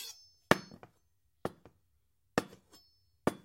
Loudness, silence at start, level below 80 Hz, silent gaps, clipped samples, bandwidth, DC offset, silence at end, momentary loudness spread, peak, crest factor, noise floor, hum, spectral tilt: -36 LUFS; 0 s; -66 dBFS; none; under 0.1%; 16 kHz; under 0.1%; 0.1 s; 23 LU; -4 dBFS; 34 dB; -78 dBFS; none; -4.5 dB/octave